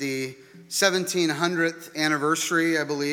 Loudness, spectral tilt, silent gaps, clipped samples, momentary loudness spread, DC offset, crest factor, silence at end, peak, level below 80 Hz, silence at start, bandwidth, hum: -24 LUFS; -3 dB/octave; none; under 0.1%; 8 LU; under 0.1%; 20 dB; 0 s; -6 dBFS; -76 dBFS; 0 s; 18 kHz; none